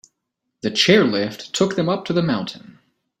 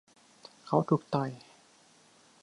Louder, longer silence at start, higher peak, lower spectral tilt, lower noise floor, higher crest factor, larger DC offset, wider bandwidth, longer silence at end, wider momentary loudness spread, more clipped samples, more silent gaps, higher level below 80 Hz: first, -19 LUFS vs -31 LUFS; about the same, 0.65 s vs 0.65 s; first, -2 dBFS vs -12 dBFS; second, -4.5 dB/octave vs -8 dB/octave; first, -78 dBFS vs -62 dBFS; about the same, 20 dB vs 22 dB; neither; first, 13 kHz vs 11 kHz; second, 0.5 s vs 1.05 s; second, 11 LU vs 25 LU; neither; neither; first, -60 dBFS vs -76 dBFS